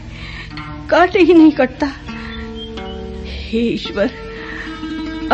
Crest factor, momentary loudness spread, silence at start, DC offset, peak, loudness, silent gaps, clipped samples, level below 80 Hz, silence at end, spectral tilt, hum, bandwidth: 16 dB; 19 LU; 0 s; under 0.1%; -2 dBFS; -15 LUFS; none; under 0.1%; -34 dBFS; 0 s; -6.5 dB/octave; none; 7.8 kHz